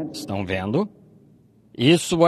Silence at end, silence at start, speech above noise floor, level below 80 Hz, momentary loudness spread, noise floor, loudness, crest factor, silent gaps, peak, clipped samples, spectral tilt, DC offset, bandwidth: 0 s; 0 s; 34 dB; -56 dBFS; 13 LU; -54 dBFS; -23 LUFS; 20 dB; none; -4 dBFS; under 0.1%; -5 dB/octave; under 0.1%; 14 kHz